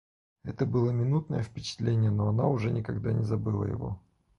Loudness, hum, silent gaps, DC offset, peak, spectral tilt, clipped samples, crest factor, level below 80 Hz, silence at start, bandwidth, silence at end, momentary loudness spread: -29 LUFS; none; none; under 0.1%; -12 dBFS; -8 dB/octave; under 0.1%; 16 dB; -52 dBFS; 0.45 s; 7.2 kHz; 0.4 s; 10 LU